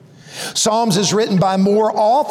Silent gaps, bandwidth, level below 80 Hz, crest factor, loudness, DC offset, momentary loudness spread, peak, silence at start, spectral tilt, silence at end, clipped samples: none; 16 kHz; -58 dBFS; 10 dB; -15 LUFS; under 0.1%; 9 LU; -6 dBFS; 0.25 s; -4.5 dB/octave; 0 s; under 0.1%